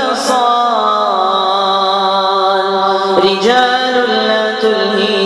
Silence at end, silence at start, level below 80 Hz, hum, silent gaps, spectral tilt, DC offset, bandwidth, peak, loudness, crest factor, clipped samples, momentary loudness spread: 0 s; 0 s; -58 dBFS; none; none; -3.5 dB/octave; under 0.1%; 12.5 kHz; 0 dBFS; -12 LUFS; 12 dB; under 0.1%; 2 LU